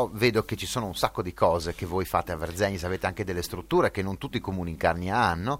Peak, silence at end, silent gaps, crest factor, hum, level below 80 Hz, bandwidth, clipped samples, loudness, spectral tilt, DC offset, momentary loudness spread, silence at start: -6 dBFS; 0 s; none; 22 dB; none; -48 dBFS; 17 kHz; under 0.1%; -28 LUFS; -5 dB/octave; under 0.1%; 7 LU; 0 s